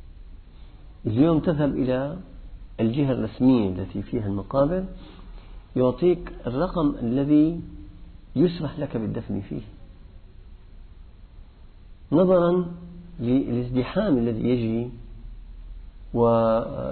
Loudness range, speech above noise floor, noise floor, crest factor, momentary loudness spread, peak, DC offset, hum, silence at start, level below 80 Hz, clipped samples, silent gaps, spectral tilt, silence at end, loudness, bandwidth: 7 LU; 23 dB; -46 dBFS; 18 dB; 22 LU; -8 dBFS; under 0.1%; none; 0.05 s; -42 dBFS; under 0.1%; none; -12 dB/octave; 0 s; -24 LUFS; 4.5 kHz